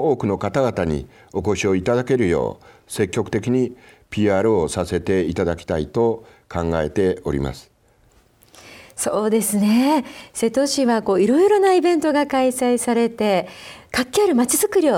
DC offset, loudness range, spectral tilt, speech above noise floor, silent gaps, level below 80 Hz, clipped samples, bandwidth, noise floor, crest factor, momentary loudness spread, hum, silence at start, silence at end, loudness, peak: under 0.1%; 6 LU; -5 dB/octave; 37 dB; none; -44 dBFS; under 0.1%; 17.5 kHz; -56 dBFS; 14 dB; 10 LU; none; 0 s; 0 s; -20 LUFS; -4 dBFS